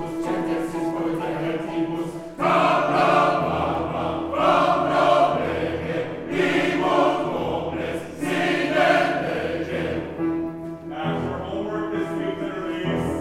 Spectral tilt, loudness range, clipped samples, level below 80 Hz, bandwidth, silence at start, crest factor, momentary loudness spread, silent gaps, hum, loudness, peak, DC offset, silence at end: -6 dB/octave; 7 LU; under 0.1%; -50 dBFS; 14.5 kHz; 0 s; 16 dB; 10 LU; none; none; -23 LUFS; -6 dBFS; under 0.1%; 0 s